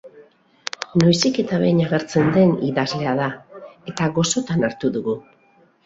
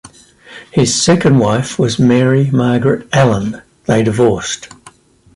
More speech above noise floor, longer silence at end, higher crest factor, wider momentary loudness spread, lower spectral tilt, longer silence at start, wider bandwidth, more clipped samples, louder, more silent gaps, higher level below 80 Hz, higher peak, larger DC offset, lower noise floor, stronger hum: first, 38 dB vs 32 dB; about the same, 0.65 s vs 0.7 s; first, 20 dB vs 12 dB; first, 14 LU vs 9 LU; about the same, -5.5 dB/octave vs -5.5 dB/octave; about the same, 0.05 s vs 0.05 s; second, 8 kHz vs 11.5 kHz; neither; second, -20 LUFS vs -13 LUFS; neither; second, -56 dBFS vs -44 dBFS; about the same, -2 dBFS vs -2 dBFS; neither; first, -56 dBFS vs -43 dBFS; neither